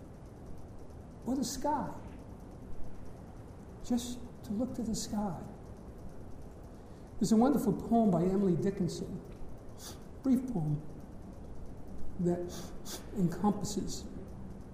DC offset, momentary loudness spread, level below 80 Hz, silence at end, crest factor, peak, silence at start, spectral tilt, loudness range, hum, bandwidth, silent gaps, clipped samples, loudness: under 0.1%; 21 LU; -50 dBFS; 0 s; 20 dB; -16 dBFS; 0 s; -6.5 dB/octave; 9 LU; none; 15.5 kHz; none; under 0.1%; -34 LUFS